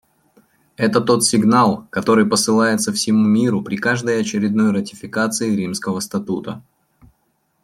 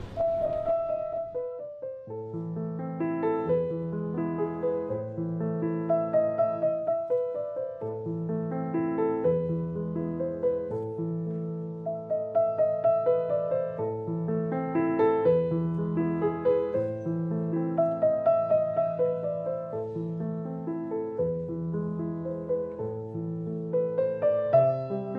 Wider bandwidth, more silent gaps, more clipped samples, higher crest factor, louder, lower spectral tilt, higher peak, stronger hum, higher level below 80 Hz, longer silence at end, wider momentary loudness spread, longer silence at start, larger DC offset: first, 14.5 kHz vs 4.3 kHz; neither; neither; about the same, 16 dB vs 18 dB; first, -17 LUFS vs -29 LUFS; second, -4.5 dB/octave vs -11.5 dB/octave; first, -2 dBFS vs -10 dBFS; neither; about the same, -60 dBFS vs -60 dBFS; first, 1.05 s vs 0 s; about the same, 9 LU vs 9 LU; first, 0.8 s vs 0 s; neither